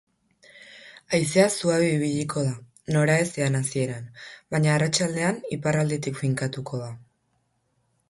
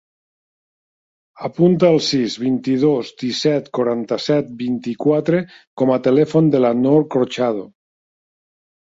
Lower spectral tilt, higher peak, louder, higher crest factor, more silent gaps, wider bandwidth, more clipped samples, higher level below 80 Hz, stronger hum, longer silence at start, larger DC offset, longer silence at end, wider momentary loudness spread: second, -5 dB/octave vs -6.5 dB/octave; second, -6 dBFS vs -2 dBFS; second, -24 LUFS vs -17 LUFS; about the same, 20 dB vs 16 dB; second, none vs 5.67-5.77 s; first, 11.5 kHz vs 7.8 kHz; neither; about the same, -60 dBFS vs -62 dBFS; neither; second, 0.55 s vs 1.4 s; neither; about the same, 1.1 s vs 1.15 s; first, 17 LU vs 9 LU